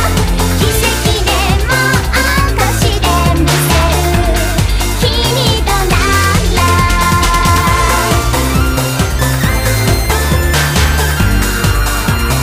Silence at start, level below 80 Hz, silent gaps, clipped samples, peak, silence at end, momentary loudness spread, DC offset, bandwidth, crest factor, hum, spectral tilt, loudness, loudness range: 0 s; -16 dBFS; none; under 0.1%; 0 dBFS; 0 s; 3 LU; under 0.1%; 15.5 kHz; 10 dB; none; -4 dB/octave; -11 LUFS; 1 LU